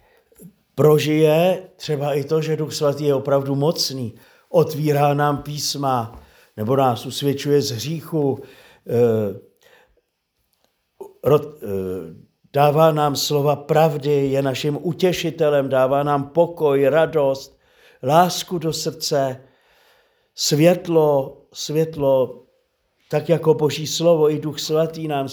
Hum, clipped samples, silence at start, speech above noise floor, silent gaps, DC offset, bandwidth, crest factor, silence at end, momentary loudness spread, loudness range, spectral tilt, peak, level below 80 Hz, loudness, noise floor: none; under 0.1%; 0.4 s; 53 dB; none; under 0.1%; over 20 kHz; 20 dB; 0 s; 11 LU; 5 LU; -5.5 dB/octave; 0 dBFS; -58 dBFS; -19 LUFS; -72 dBFS